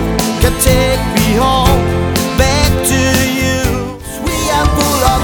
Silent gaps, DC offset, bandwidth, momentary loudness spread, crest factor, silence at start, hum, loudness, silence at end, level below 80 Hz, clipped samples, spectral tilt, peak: none; under 0.1%; over 20 kHz; 6 LU; 12 dB; 0 s; none; -12 LUFS; 0 s; -20 dBFS; under 0.1%; -4.5 dB/octave; 0 dBFS